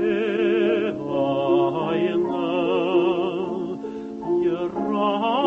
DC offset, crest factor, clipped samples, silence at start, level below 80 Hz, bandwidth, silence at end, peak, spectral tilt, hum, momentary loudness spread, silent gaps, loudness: under 0.1%; 14 dB; under 0.1%; 0 s; -60 dBFS; 6.4 kHz; 0 s; -8 dBFS; -7.5 dB/octave; none; 7 LU; none; -23 LUFS